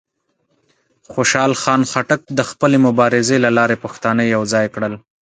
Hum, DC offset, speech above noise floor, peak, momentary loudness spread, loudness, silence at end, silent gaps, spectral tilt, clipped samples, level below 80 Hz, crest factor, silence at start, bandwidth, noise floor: none; under 0.1%; 51 dB; 0 dBFS; 8 LU; -16 LUFS; 0.25 s; none; -4.5 dB/octave; under 0.1%; -58 dBFS; 16 dB; 1.1 s; 9.4 kHz; -66 dBFS